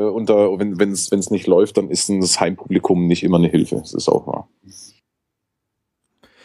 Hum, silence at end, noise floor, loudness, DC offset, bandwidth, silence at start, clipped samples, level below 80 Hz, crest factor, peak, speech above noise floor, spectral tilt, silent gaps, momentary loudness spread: none; 1.6 s; -78 dBFS; -17 LUFS; under 0.1%; 12.5 kHz; 0 s; under 0.1%; -54 dBFS; 18 dB; -2 dBFS; 61 dB; -5 dB/octave; none; 5 LU